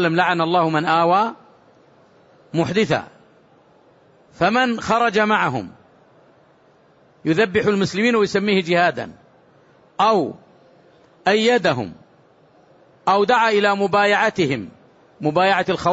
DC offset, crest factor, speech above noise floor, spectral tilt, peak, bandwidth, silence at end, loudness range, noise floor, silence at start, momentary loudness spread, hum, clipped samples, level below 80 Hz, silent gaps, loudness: under 0.1%; 16 dB; 36 dB; -5.5 dB/octave; -4 dBFS; 8 kHz; 0 s; 4 LU; -54 dBFS; 0 s; 11 LU; none; under 0.1%; -58 dBFS; none; -18 LUFS